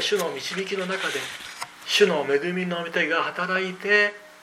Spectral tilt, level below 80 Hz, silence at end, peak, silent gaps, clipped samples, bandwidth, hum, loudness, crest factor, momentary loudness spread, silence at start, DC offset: -3.5 dB/octave; -74 dBFS; 0 s; -6 dBFS; none; under 0.1%; 16.5 kHz; none; -24 LUFS; 20 dB; 10 LU; 0 s; under 0.1%